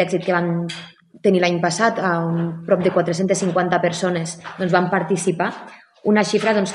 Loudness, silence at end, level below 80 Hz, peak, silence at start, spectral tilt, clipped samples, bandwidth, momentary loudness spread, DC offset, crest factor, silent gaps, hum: -20 LUFS; 0 s; -64 dBFS; 0 dBFS; 0 s; -5.5 dB/octave; under 0.1%; 11.5 kHz; 8 LU; under 0.1%; 18 dB; none; none